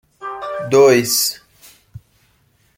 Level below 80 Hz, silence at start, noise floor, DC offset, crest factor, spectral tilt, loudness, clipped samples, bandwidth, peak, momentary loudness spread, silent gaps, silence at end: -58 dBFS; 0.2 s; -58 dBFS; under 0.1%; 16 dB; -3 dB/octave; -14 LUFS; under 0.1%; 16.5 kHz; -2 dBFS; 19 LU; none; 0.8 s